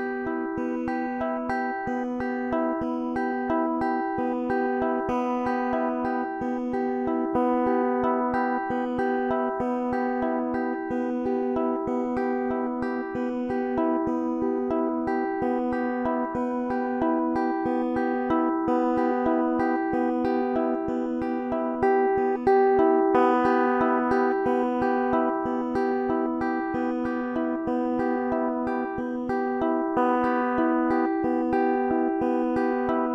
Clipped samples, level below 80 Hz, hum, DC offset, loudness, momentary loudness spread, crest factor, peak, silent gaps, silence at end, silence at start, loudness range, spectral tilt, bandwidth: under 0.1%; -54 dBFS; none; under 0.1%; -26 LUFS; 6 LU; 18 dB; -6 dBFS; none; 0 s; 0 s; 5 LU; -8 dB/octave; 6 kHz